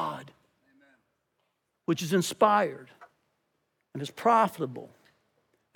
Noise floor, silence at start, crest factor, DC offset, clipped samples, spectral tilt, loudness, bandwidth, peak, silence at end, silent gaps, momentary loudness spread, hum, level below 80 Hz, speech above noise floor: -78 dBFS; 0 s; 24 dB; under 0.1%; under 0.1%; -5 dB/octave; -27 LUFS; 19 kHz; -8 dBFS; 0.9 s; none; 20 LU; none; -84 dBFS; 51 dB